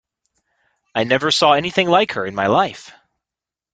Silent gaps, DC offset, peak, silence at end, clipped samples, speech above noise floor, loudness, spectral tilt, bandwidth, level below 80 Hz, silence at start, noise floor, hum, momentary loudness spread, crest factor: none; under 0.1%; 0 dBFS; 0.85 s; under 0.1%; 71 dB; -17 LUFS; -4 dB/octave; 9.4 kHz; -58 dBFS; 0.95 s; -88 dBFS; none; 9 LU; 18 dB